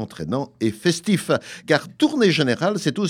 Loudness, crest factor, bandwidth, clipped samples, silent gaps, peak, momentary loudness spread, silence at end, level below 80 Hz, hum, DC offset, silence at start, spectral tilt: -21 LUFS; 20 dB; 16 kHz; under 0.1%; none; -2 dBFS; 8 LU; 0 s; -60 dBFS; none; under 0.1%; 0 s; -5 dB/octave